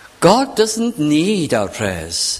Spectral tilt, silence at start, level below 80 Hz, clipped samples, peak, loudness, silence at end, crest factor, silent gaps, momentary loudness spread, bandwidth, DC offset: -4 dB/octave; 0.2 s; -44 dBFS; under 0.1%; 0 dBFS; -16 LUFS; 0 s; 16 dB; none; 7 LU; 15.5 kHz; under 0.1%